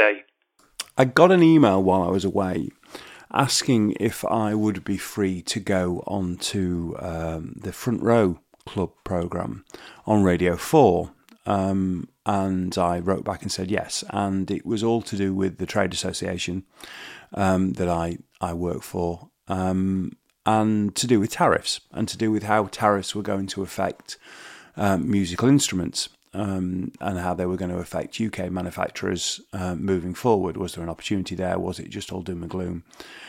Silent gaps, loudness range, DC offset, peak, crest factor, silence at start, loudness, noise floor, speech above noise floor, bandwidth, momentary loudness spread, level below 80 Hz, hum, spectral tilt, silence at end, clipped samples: none; 5 LU; under 0.1%; 0 dBFS; 24 dB; 0 s; -24 LUFS; -63 dBFS; 39 dB; 16.5 kHz; 13 LU; -52 dBFS; none; -5.5 dB/octave; 0 s; under 0.1%